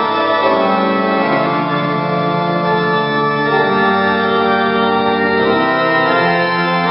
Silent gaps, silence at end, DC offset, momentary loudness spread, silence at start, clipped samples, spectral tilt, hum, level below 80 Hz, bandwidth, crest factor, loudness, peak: none; 0 s; under 0.1%; 3 LU; 0 s; under 0.1%; -11 dB/octave; none; -54 dBFS; 5.8 kHz; 12 dB; -14 LUFS; -2 dBFS